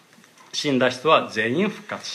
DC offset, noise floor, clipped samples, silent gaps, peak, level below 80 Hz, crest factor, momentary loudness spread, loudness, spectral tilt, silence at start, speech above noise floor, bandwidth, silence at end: under 0.1%; -51 dBFS; under 0.1%; none; -4 dBFS; -74 dBFS; 20 dB; 10 LU; -22 LUFS; -4.5 dB/octave; 0.55 s; 30 dB; 14.5 kHz; 0 s